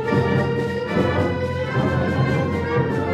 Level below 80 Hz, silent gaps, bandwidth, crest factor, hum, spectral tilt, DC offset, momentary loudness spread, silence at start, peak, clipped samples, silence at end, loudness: -42 dBFS; none; 10 kHz; 14 dB; none; -8 dB/octave; under 0.1%; 3 LU; 0 s; -6 dBFS; under 0.1%; 0 s; -21 LUFS